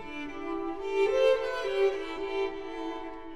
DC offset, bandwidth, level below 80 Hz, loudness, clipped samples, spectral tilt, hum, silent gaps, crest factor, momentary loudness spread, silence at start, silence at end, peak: 0.5%; 11 kHz; -54 dBFS; -30 LUFS; under 0.1%; -4 dB/octave; none; none; 16 dB; 12 LU; 0 s; 0 s; -14 dBFS